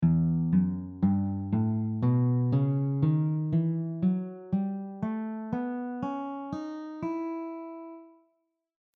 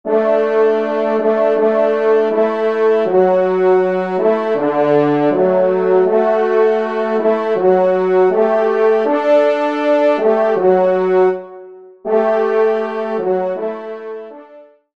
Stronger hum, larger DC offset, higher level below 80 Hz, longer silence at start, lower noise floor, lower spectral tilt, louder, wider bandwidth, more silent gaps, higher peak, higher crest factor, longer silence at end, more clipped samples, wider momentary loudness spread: neither; second, under 0.1% vs 0.4%; first, -58 dBFS vs -66 dBFS; about the same, 0 s vs 0.05 s; first, -77 dBFS vs -42 dBFS; first, -11.5 dB/octave vs -8 dB/octave; second, -29 LUFS vs -14 LUFS; second, 4.3 kHz vs 6.6 kHz; neither; second, -14 dBFS vs -2 dBFS; about the same, 14 dB vs 12 dB; first, 0.9 s vs 0.3 s; neither; first, 11 LU vs 6 LU